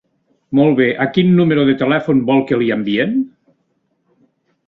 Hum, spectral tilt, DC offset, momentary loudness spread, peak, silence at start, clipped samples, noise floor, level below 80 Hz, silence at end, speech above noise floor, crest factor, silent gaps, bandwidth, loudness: none; -9.5 dB/octave; under 0.1%; 6 LU; -2 dBFS; 0.5 s; under 0.1%; -65 dBFS; -54 dBFS; 1.4 s; 52 dB; 14 dB; none; 4.8 kHz; -15 LUFS